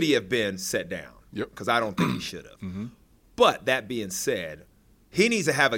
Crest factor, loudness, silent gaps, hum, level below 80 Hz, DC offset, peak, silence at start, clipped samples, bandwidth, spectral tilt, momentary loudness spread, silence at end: 20 dB; -26 LUFS; none; none; -58 dBFS; under 0.1%; -6 dBFS; 0 s; under 0.1%; 17 kHz; -4 dB/octave; 16 LU; 0 s